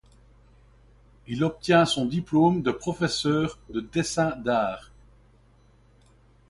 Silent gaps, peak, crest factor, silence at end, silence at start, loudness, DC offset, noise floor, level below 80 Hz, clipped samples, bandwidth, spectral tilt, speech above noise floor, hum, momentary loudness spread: none; -8 dBFS; 20 dB; 1.65 s; 1.3 s; -25 LUFS; under 0.1%; -58 dBFS; -54 dBFS; under 0.1%; 11.5 kHz; -5.5 dB/octave; 33 dB; none; 9 LU